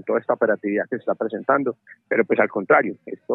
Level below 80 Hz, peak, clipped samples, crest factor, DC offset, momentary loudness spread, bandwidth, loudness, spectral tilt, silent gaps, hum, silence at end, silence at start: -82 dBFS; -2 dBFS; under 0.1%; 18 dB; under 0.1%; 10 LU; 4 kHz; -21 LUFS; -10 dB/octave; none; none; 0 s; 0.05 s